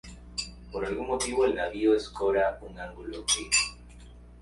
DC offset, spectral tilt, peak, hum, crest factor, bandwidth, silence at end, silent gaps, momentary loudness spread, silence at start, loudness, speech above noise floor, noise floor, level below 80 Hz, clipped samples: under 0.1%; -2 dB/octave; -10 dBFS; 60 Hz at -45 dBFS; 20 dB; 11.5 kHz; 0 s; none; 14 LU; 0.05 s; -28 LUFS; 21 dB; -49 dBFS; -48 dBFS; under 0.1%